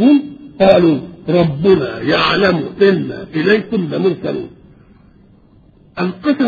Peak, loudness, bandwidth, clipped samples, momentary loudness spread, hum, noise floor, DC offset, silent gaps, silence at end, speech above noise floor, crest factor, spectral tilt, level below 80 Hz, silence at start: 0 dBFS; -14 LUFS; 6.8 kHz; under 0.1%; 11 LU; none; -47 dBFS; under 0.1%; none; 0 s; 33 dB; 14 dB; -8 dB/octave; -46 dBFS; 0 s